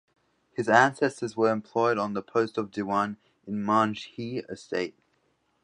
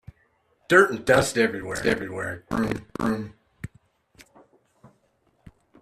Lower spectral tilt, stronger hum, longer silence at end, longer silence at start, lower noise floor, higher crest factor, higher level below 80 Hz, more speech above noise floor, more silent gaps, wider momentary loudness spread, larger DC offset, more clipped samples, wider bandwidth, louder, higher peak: about the same, -5.5 dB/octave vs -4.5 dB/octave; neither; second, 0.75 s vs 2.15 s; about the same, 0.6 s vs 0.7 s; first, -71 dBFS vs -67 dBFS; about the same, 24 dB vs 24 dB; second, -70 dBFS vs -52 dBFS; about the same, 44 dB vs 44 dB; neither; second, 15 LU vs 24 LU; neither; neither; second, 11 kHz vs 14 kHz; second, -27 LUFS vs -23 LUFS; about the same, -4 dBFS vs -4 dBFS